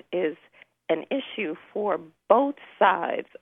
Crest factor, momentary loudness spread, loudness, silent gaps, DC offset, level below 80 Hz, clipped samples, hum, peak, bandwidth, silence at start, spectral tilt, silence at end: 22 dB; 10 LU; -26 LUFS; none; under 0.1%; -76 dBFS; under 0.1%; none; -4 dBFS; 3.9 kHz; 0.1 s; -7.5 dB/octave; 0.2 s